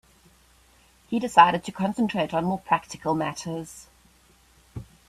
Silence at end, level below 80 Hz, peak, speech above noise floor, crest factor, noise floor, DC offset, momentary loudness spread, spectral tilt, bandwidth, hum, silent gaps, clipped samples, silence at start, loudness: 0.25 s; -58 dBFS; -2 dBFS; 35 dB; 24 dB; -58 dBFS; under 0.1%; 25 LU; -5 dB/octave; 14 kHz; none; none; under 0.1%; 1.1 s; -24 LUFS